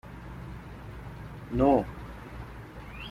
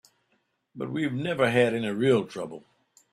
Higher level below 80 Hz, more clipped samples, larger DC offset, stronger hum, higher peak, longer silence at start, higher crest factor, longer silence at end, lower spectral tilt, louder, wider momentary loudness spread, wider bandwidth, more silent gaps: first, -46 dBFS vs -66 dBFS; neither; neither; neither; about the same, -10 dBFS vs -8 dBFS; second, 0.05 s vs 0.75 s; about the same, 22 dB vs 20 dB; second, 0 s vs 0.55 s; first, -8.5 dB/octave vs -6.5 dB/octave; about the same, -27 LUFS vs -26 LUFS; first, 20 LU vs 16 LU; first, 15 kHz vs 13.5 kHz; neither